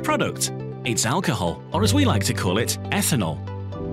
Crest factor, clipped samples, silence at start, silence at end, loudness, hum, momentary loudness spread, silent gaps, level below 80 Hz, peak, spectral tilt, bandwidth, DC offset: 14 dB; under 0.1%; 0 s; 0 s; -23 LUFS; none; 9 LU; none; -48 dBFS; -8 dBFS; -4.5 dB/octave; 16 kHz; under 0.1%